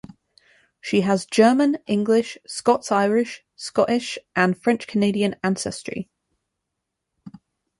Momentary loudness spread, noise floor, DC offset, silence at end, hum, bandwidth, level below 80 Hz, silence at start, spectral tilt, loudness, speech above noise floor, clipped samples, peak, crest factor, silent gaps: 14 LU; -81 dBFS; under 0.1%; 0.5 s; none; 11.5 kHz; -62 dBFS; 0.85 s; -5 dB/octave; -21 LUFS; 60 dB; under 0.1%; -4 dBFS; 20 dB; none